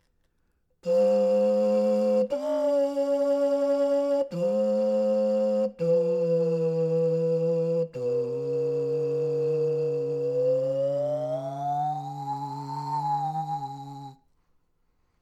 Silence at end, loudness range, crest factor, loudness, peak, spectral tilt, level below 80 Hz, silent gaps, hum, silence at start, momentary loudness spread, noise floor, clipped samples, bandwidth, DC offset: 1.05 s; 6 LU; 12 dB; -26 LUFS; -14 dBFS; -8 dB/octave; -72 dBFS; none; none; 0.85 s; 9 LU; -70 dBFS; under 0.1%; 8.8 kHz; under 0.1%